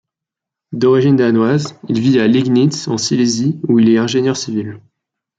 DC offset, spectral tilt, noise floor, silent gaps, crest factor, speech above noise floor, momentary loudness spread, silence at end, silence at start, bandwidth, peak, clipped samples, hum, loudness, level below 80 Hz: under 0.1%; -6 dB/octave; -84 dBFS; none; 12 dB; 71 dB; 9 LU; 0.6 s; 0.7 s; 9 kHz; -2 dBFS; under 0.1%; none; -14 LUFS; -58 dBFS